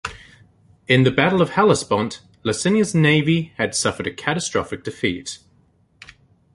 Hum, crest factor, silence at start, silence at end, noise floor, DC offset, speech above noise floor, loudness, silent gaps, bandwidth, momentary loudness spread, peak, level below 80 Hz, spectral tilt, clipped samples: none; 20 dB; 0.05 s; 1.2 s; -58 dBFS; under 0.1%; 39 dB; -19 LUFS; none; 11.5 kHz; 13 LU; 0 dBFS; -50 dBFS; -5 dB/octave; under 0.1%